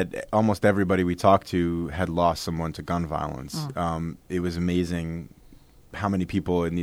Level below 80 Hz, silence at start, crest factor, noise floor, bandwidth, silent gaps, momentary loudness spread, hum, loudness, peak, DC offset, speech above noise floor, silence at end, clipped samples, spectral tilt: -46 dBFS; 0 s; 20 dB; -51 dBFS; 15.5 kHz; none; 11 LU; none; -26 LUFS; -4 dBFS; under 0.1%; 26 dB; 0 s; under 0.1%; -6.5 dB/octave